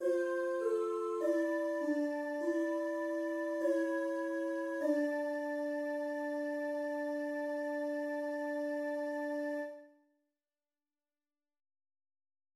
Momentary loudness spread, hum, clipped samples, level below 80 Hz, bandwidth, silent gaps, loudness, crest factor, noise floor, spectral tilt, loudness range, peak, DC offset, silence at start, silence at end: 4 LU; none; under 0.1%; -88 dBFS; 15 kHz; none; -36 LUFS; 16 dB; under -90 dBFS; -3.5 dB/octave; 7 LU; -22 dBFS; under 0.1%; 0 s; 2.7 s